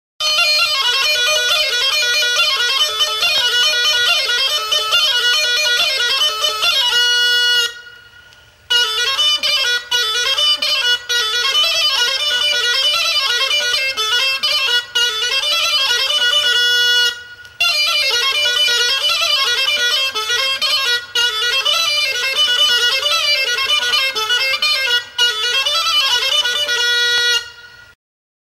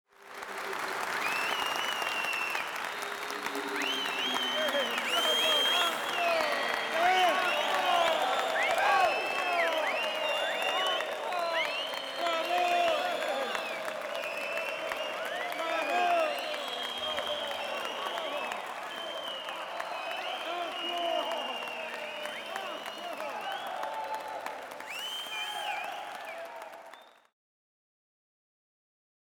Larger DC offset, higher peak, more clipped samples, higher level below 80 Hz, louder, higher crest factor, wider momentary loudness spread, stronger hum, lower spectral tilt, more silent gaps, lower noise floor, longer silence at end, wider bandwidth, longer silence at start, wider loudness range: neither; first, -4 dBFS vs -14 dBFS; neither; first, -56 dBFS vs -76 dBFS; first, -13 LUFS vs -31 LUFS; second, 12 dB vs 18 dB; second, 3 LU vs 11 LU; neither; second, 3 dB/octave vs -0.5 dB/octave; neither; second, -45 dBFS vs -53 dBFS; second, 0.9 s vs 2.2 s; second, 16 kHz vs over 20 kHz; about the same, 0.2 s vs 0.2 s; second, 1 LU vs 10 LU